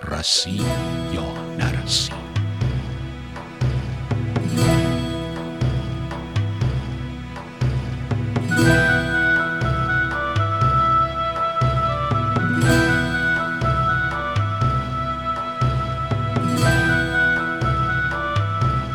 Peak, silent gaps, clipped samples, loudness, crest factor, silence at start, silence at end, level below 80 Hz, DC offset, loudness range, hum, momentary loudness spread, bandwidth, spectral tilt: -4 dBFS; none; under 0.1%; -21 LUFS; 18 dB; 0 s; 0 s; -34 dBFS; under 0.1%; 5 LU; none; 9 LU; 14.5 kHz; -5 dB/octave